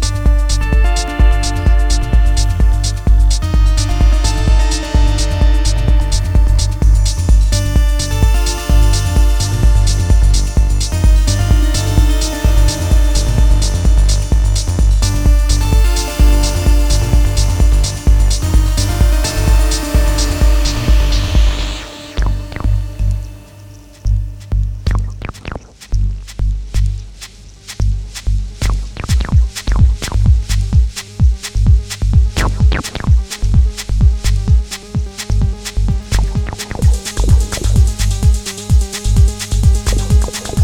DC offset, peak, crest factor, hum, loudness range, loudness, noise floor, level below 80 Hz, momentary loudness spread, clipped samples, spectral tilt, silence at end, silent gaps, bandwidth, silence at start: under 0.1%; 0 dBFS; 12 dB; none; 7 LU; -15 LUFS; -36 dBFS; -12 dBFS; 7 LU; under 0.1%; -5 dB/octave; 0 s; none; 16 kHz; 0 s